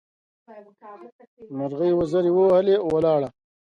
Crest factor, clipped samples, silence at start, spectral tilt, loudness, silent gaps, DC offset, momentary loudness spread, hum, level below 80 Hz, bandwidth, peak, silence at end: 14 dB; under 0.1%; 0.5 s; -8.5 dB/octave; -21 LUFS; 1.12-1.19 s, 1.27-1.37 s; under 0.1%; 14 LU; none; -58 dBFS; 7.6 kHz; -8 dBFS; 0.45 s